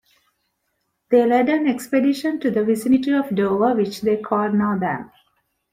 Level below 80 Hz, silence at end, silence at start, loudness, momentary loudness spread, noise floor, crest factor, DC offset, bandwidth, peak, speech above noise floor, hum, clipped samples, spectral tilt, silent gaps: -60 dBFS; 0.65 s; 1.1 s; -20 LUFS; 5 LU; -73 dBFS; 16 dB; under 0.1%; 16 kHz; -4 dBFS; 54 dB; none; under 0.1%; -6.5 dB/octave; none